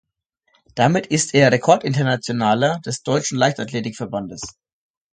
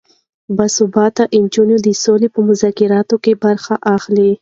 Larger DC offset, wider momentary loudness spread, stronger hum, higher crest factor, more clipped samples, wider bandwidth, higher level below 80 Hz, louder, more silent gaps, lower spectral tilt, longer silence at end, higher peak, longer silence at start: neither; first, 13 LU vs 3 LU; neither; first, 20 dB vs 12 dB; neither; first, 9.4 kHz vs 7.8 kHz; about the same, -58 dBFS vs -56 dBFS; second, -19 LUFS vs -13 LUFS; neither; about the same, -4.5 dB/octave vs -5 dB/octave; first, 0.65 s vs 0.05 s; about the same, 0 dBFS vs 0 dBFS; first, 0.75 s vs 0.5 s